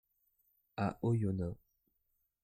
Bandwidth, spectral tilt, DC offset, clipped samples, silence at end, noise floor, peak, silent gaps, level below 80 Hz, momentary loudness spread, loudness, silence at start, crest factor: 15 kHz; -9 dB/octave; under 0.1%; under 0.1%; 0.85 s; -81 dBFS; -24 dBFS; none; -64 dBFS; 15 LU; -37 LUFS; 0.75 s; 16 dB